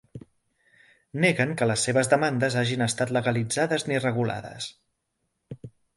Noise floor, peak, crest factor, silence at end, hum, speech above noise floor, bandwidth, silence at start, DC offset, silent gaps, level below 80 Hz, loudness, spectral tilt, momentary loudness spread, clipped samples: -78 dBFS; -6 dBFS; 20 dB; 0.3 s; none; 53 dB; 11.5 kHz; 0.15 s; under 0.1%; none; -62 dBFS; -25 LUFS; -4.5 dB/octave; 16 LU; under 0.1%